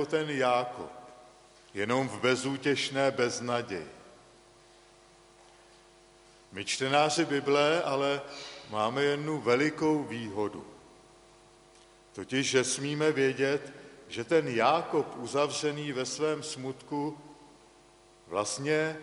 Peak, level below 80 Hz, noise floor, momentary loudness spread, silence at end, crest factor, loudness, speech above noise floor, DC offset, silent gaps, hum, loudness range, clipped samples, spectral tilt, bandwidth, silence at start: -10 dBFS; -70 dBFS; -59 dBFS; 16 LU; 0 s; 22 dB; -30 LUFS; 29 dB; under 0.1%; none; none; 6 LU; under 0.1%; -4 dB/octave; 11.5 kHz; 0 s